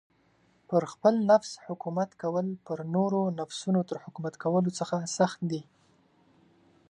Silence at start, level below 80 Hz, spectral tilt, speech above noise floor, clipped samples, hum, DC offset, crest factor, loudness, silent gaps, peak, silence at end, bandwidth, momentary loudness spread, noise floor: 0.7 s; -76 dBFS; -6 dB/octave; 38 dB; under 0.1%; none; under 0.1%; 20 dB; -29 LUFS; none; -10 dBFS; 1.25 s; 10.5 kHz; 12 LU; -66 dBFS